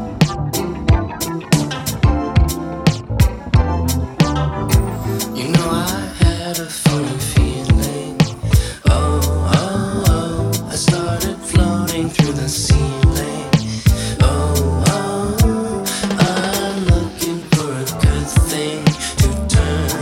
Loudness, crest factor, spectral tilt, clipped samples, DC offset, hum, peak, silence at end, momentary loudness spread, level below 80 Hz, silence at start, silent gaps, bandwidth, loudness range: -17 LUFS; 16 dB; -5.5 dB/octave; under 0.1%; under 0.1%; none; 0 dBFS; 0 s; 5 LU; -22 dBFS; 0 s; none; 17.5 kHz; 1 LU